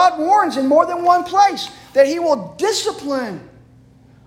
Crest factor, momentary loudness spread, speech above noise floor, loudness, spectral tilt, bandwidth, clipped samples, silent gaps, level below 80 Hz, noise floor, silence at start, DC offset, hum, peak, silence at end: 16 dB; 9 LU; 31 dB; -16 LUFS; -3.5 dB/octave; 16.5 kHz; under 0.1%; none; -58 dBFS; -47 dBFS; 0 s; under 0.1%; none; -2 dBFS; 0.8 s